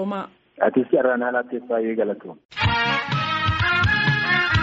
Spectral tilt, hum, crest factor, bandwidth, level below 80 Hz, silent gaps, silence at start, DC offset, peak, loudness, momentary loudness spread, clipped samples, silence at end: -3.5 dB/octave; none; 16 dB; 7.8 kHz; -42 dBFS; 2.45-2.49 s; 0 s; under 0.1%; -4 dBFS; -21 LUFS; 10 LU; under 0.1%; 0 s